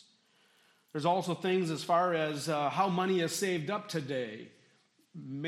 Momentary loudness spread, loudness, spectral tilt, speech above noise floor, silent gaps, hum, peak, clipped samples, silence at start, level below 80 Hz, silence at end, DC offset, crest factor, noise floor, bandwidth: 14 LU; -32 LUFS; -5 dB/octave; 37 dB; none; none; -16 dBFS; under 0.1%; 0.95 s; -80 dBFS; 0 s; under 0.1%; 18 dB; -69 dBFS; 15.5 kHz